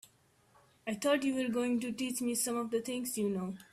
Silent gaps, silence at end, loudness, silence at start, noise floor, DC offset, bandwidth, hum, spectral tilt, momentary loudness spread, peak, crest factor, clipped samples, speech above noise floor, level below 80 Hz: none; 0.1 s; -34 LUFS; 0.85 s; -68 dBFS; under 0.1%; 15.5 kHz; none; -4 dB/octave; 6 LU; -18 dBFS; 16 dB; under 0.1%; 34 dB; -74 dBFS